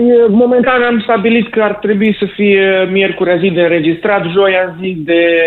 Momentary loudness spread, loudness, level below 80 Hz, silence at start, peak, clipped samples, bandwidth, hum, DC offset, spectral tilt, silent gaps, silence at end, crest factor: 5 LU; -11 LUFS; -48 dBFS; 0 s; 0 dBFS; under 0.1%; 4.3 kHz; none; under 0.1%; -9 dB/octave; none; 0 s; 10 dB